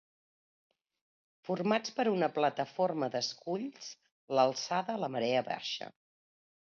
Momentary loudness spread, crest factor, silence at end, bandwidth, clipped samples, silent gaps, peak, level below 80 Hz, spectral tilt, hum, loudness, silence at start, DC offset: 12 LU; 20 dB; 0.85 s; 7.4 kHz; under 0.1%; 4.12-4.28 s; -14 dBFS; -84 dBFS; -4.5 dB/octave; none; -33 LUFS; 1.45 s; under 0.1%